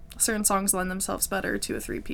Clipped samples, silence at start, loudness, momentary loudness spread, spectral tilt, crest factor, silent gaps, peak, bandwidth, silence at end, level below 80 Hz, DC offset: under 0.1%; 0 s; -26 LUFS; 8 LU; -2.5 dB/octave; 20 dB; none; -6 dBFS; 19 kHz; 0 s; -44 dBFS; under 0.1%